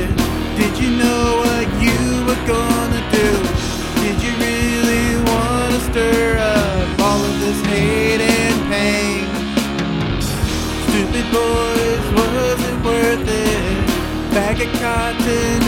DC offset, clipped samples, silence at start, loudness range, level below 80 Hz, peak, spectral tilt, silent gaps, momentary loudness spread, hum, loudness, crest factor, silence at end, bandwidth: under 0.1%; under 0.1%; 0 s; 2 LU; -26 dBFS; 0 dBFS; -5 dB/octave; none; 4 LU; none; -17 LUFS; 16 dB; 0 s; 16.5 kHz